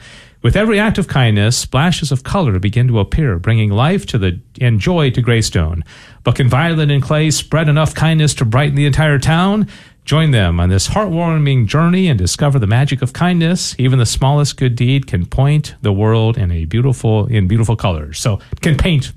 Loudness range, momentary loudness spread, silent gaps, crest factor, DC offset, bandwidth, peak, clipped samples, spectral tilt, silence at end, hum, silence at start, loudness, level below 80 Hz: 2 LU; 5 LU; none; 12 dB; under 0.1%; 13.5 kHz; -2 dBFS; under 0.1%; -5.5 dB/octave; 0 s; none; 0.1 s; -14 LUFS; -30 dBFS